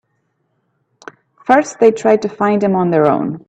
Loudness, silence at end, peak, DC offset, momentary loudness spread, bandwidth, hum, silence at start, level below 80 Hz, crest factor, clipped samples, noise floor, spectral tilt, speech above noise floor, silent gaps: -14 LUFS; 0.1 s; 0 dBFS; under 0.1%; 4 LU; 8.6 kHz; none; 1.45 s; -60 dBFS; 16 dB; under 0.1%; -66 dBFS; -6.5 dB/octave; 53 dB; none